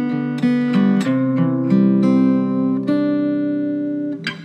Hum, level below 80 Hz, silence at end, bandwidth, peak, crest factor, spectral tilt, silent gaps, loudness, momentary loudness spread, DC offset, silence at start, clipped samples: none; -80 dBFS; 0 s; 8.6 kHz; -4 dBFS; 14 dB; -8.5 dB/octave; none; -18 LUFS; 7 LU; under 0.1%; 0 s; under 0.1%